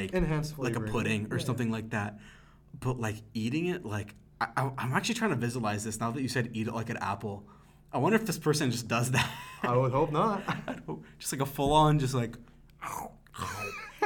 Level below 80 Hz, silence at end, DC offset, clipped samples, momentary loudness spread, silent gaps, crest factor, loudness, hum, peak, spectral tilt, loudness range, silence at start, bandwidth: -50 dBFS; 0 s; under 0.1%; under 0.1%; 12 LU; none; 20 dB; -31 LUFS; none; -10 dBFS; -5.5 dB/octave; 5 LU; 0 s; 19 kHz